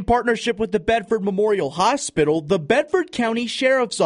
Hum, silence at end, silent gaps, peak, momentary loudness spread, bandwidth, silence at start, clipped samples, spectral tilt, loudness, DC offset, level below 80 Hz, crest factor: none; 0 s; none; -2 dBFS; 3 LU; 10.5 kHz; 0 s; under 0.1%; -4.5 dB/octave; -20 LUFS; under 0.1%; -44 dBFS; 18 dB